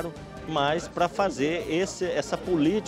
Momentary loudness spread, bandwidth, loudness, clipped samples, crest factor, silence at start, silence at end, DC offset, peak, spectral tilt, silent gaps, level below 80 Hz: 6 LU; 15 kHz; -27 LUFS; under 0.1%; 16 dB; 0 s; 0 s; under 0.1%; -10 dBFS; -5 dB/octave; none; -52 dBFS